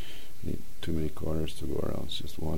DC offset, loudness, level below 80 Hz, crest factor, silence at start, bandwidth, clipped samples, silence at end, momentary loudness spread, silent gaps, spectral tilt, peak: 5%; -36 LUFS; -44 dBFS; 16 dB; 0 s; 16 kHz; under 0.1%; 0 s; 6 LU; none; -6 dB/octave; -16 dBFS